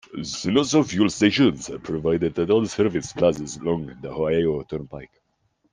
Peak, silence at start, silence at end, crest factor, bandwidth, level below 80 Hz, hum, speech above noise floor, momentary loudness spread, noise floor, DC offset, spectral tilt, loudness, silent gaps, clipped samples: -4 dBFS; 0.1 s; 0.7 s; 18 dB; 10 kHz; -52 dBFS; none; 46 dB; 14 LU; -69 dBFS; under 0.1%; -5 dB/octave; -22 LUFS; none; under 0.1%